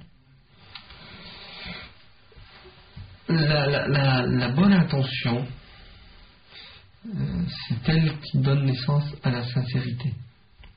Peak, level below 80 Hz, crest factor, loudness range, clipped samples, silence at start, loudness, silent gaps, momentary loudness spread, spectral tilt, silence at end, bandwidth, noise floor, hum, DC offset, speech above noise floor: -8 dBFS; -48 dBFS; 18 dB; 7 LU; under 0.1%; 0 s; -24 LUFS; none; 23 LU; -5.5 dB/octave; 0.1 s; 5.2 kHz; -56 dBFS; none; under 0.1%; 33 dB